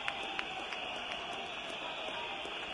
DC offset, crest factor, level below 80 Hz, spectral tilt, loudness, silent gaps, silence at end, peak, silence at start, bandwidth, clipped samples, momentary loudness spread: under 0.1%; 24 dB; -68 dBFS; -2 dB/octave; -39 LUFS; none; 0 s; -16 dBFS; 0 s; 11.5 kHz; under 0.1%; 2 LU